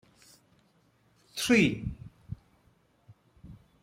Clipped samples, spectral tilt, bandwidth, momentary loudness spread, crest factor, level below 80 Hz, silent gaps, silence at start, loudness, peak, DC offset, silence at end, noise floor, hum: under 0.1%; -4.5 dB/octave; 16 kHz; 23 LU; 22 dB; -54 dBFS; none; 1.35 s; -27 LUFS; -12 dBFS; under 0.1%; 0.3 s; -67 dBFS; none